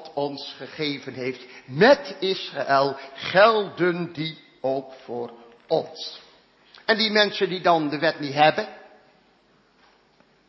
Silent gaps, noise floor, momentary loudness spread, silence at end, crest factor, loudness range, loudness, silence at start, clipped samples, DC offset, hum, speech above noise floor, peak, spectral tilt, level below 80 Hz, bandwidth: none; -60 dBFS; 18 LU; 1.7 s; 20 dB; 5 LU; -23 LUFS; 0 s; under 0.1%; under 0.1%; none; 38 dB; -6 dBFS; -5.5 dB/octave; -70 dBFS; 6 kHz